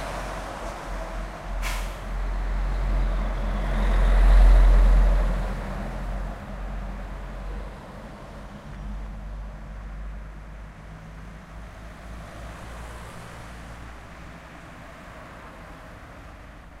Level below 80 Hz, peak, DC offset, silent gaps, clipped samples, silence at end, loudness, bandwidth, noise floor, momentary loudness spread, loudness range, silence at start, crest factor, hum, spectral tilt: -26 dBFS; -8 dBFS; under 0.1%; none; under 0.1%; 0 s; -28 LUFS; 9.6 kHz; -43 dBFS; 21 LU; 18 LU; 0 s; 18 dB; none; -6.5 dB/octave